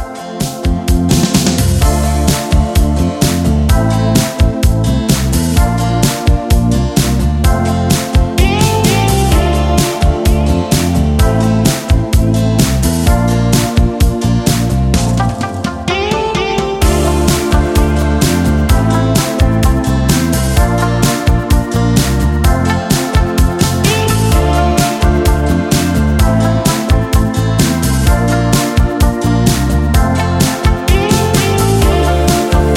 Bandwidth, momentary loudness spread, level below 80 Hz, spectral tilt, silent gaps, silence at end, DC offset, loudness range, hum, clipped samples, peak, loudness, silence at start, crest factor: 17 kHz; 2 LU; -16 dBFS; -5.5 dB/octave; none; 0 s; under 0.1%; 1 LU; none; under 0.1%; 0 dBFS; -12 LUFS; 0 s; 10 dB